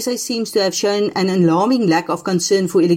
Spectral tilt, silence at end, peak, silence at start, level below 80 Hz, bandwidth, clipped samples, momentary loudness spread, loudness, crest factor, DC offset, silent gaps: -5 dB/octave; 0 s; -4 dBFS; 0 s; -62 dBFS; 16.5 kHz; under 0.1%; 5 LU; -17 LUFS; 12 dB; under 0.1%; none